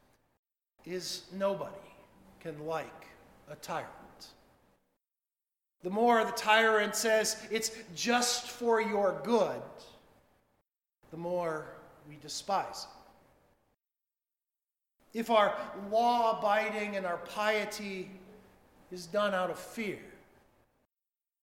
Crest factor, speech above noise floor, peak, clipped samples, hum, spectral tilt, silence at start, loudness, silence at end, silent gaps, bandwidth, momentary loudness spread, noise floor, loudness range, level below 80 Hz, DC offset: 24 dB; over 58 dB; -10 dBFS; under 0.1%; none; -3 dB/octave; 0.85 s; -31 LUFS; 1.25 s; none; 17 kHz; 20 LU; under -90 dBFS; 13 LU; -72 dBFS; under 0.1%